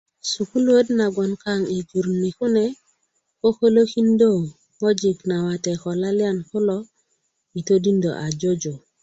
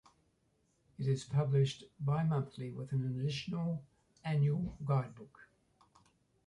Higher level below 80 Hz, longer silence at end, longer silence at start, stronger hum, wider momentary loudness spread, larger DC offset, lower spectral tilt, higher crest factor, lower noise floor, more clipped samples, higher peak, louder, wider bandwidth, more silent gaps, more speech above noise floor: about the same, -60 dBFS vs -64 dBFS; second, 0.25 s vs 1.05 s; second, 0.25 s vs 1 s; neither; about the same, 9 LU vs 11 LU; neither; second, -6 dB/octave vs -7.5 dB/octave; about the same, 16 dB vs 16 dB; second, -71 dBFS vs -76 dBFS; neither; first, -6 dBFS vs -22 dBFS; first, -21 LUFS vs -36 LUFS; second, 8.2 kHz vs 10.5 kHz; neither; first, 51 dB vs 41 dB